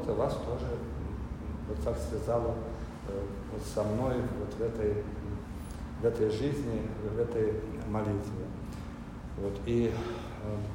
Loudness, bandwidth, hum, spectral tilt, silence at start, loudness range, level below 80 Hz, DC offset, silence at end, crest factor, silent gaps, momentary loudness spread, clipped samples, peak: -34 LUFS; 16 kHz; none; -7.5 dB/octave; 0 s; 2 LU; -42 dBFS; under 0.1%; 0 s; 16 dB; none; 10 LU; under 0.1%; -16 dBFS